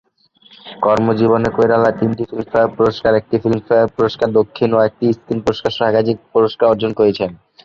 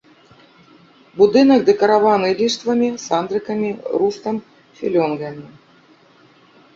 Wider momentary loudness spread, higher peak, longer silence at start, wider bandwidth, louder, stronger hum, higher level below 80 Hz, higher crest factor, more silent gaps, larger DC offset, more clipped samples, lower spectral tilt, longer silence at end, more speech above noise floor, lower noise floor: second, 6 LU vs 15 LU; about the same, -2 dBFS vs -2 dBFS; second, 0.65 s vs 1.15 s; about the same, 7.4 kHz vs 7.6 kHz; about the same, -16 LUFS vs -17 LUFS; neither; first, -48 dBFS vs -60 dBFS; about the same, 14 dB vs 16 dB; neither; neither; neither; first, -7.5 dB/octave vs -5 dB/octave; second, 0.3 s vs 1.3 s; about the same, 36 dB vs 34 dB; about the same, -51 dBFS vs -51 dBFS